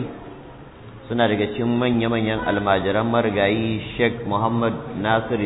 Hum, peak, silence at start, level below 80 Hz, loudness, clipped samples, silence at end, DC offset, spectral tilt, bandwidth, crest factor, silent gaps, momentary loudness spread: none; -6 dBFS; 0 s; -46 dBFS; -21 LUFS; under 0.1%; 0 s; under 0.1%; -10 dB/octave; 4.1 kHz; 16 dB; none; 20 LU